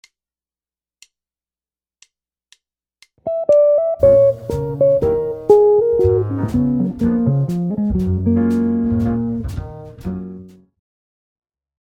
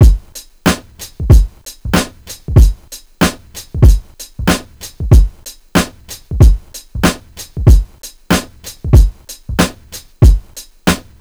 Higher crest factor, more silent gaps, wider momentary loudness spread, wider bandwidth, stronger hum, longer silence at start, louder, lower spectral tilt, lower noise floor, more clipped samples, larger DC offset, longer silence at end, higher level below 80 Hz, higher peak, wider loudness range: first, 18 dB vs 12 dB; neither; second, 16 LU vs 20 LU; second, 9.4 kHz vs over 20 kHz; neither; first, 3.25 s vs 0 s; about the same, -16 LUFS vs -14 LUFS; first, -10 dB/octave vs -5.5 dB/octave; first, under -90 dBFS vs -35 dBFS; second, under 0.1% vs 3%; neither; first, 1.45 s vs 0.2 s; second, -38 dBFS vs -14 dBFS; about the same, 0 dBFS vs 0 dBFS; first, 8 LU vs 1 LU